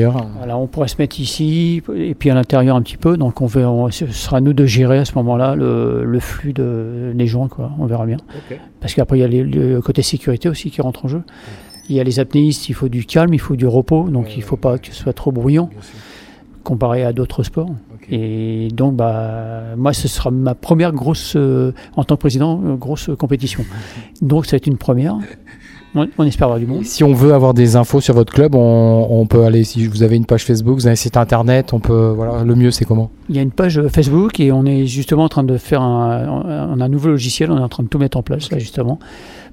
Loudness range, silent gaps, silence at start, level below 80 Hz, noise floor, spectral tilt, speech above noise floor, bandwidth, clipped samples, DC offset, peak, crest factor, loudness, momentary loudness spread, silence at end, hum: 7 LU; none; 0 s; -34 dBFS; -40 dBFS; -7 dB/octave; 25 dB; 16 kHz; under 0.1%; under 0.1%; 0 dBFS; 14 dB; -15 LUFS; 10 LU; 0.05 s; none